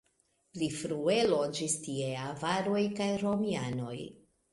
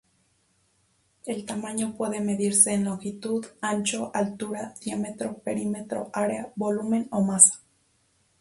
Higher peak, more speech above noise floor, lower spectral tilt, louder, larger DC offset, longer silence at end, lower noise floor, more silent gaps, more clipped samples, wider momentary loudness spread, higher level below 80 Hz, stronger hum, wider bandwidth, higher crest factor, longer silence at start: second, -16 dBFS vs -2 dBFS; about the same, 42 dB vs 42 dB; about the same, -4.5 dB/octave vs -3.5 dB/octave; second, -32 LUFS vs -25 LUFS; neither; second, 0.35 s vs 0.8 s; first, -74 dBFS vs -68 dBFS; neither; neither; second, 10 LU vs 16 LU; about the same, -68 dBFS vs -68 dBFS; neither; about the same, 11.5 kHz vs 11.5 kHz; second, 18 dB vs 26 dB; second, 0.55 s vs 1.25 s